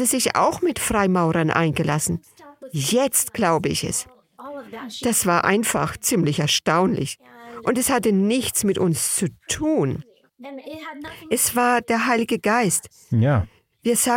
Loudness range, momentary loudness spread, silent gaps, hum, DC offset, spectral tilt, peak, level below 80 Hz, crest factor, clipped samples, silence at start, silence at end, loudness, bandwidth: 2 LU; 16 LU; none; none; under 0.1%; -4 dB/octave; -2 dBFS; -50 dBFS; 20 dB; under 0.1%; 0 s; 0 s; -21 LUFS; 17 kHz